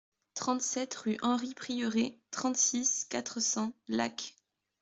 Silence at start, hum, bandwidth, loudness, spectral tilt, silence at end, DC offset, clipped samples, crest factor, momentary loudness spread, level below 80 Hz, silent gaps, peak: 0.35 s; none; 8.2 kHz; -32 LUFS; -2 dB/octave; 0.5 s; under 0.1%; under 0.1%; 18 dB; 9 LU; -76 dBFS; none; -16 dBFS